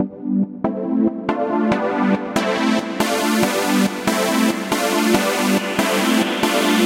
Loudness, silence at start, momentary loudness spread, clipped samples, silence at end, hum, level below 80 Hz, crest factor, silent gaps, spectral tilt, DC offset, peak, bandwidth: -19 LUFS; 0 s; 4 LU; under 0.1%; 0 s; none; -52 dBFS; 16 dB; none; -4 dB/octave; under 0.1%; -2 dBFS; 16 kHz